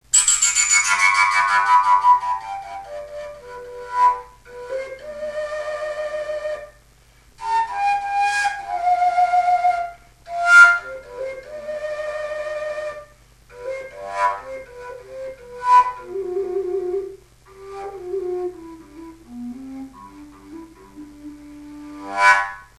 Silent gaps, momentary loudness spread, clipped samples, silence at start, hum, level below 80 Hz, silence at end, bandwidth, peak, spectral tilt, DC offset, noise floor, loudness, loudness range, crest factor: none; 23 LU; under 0.1%; 0.15 s; none; -54 dBFS; 0.15 s; 14 kHz; 0 dBFS; 0 dB/octave; under 0.1%; -52 dBFS; -18 LUFS; 16 LU; 22 dB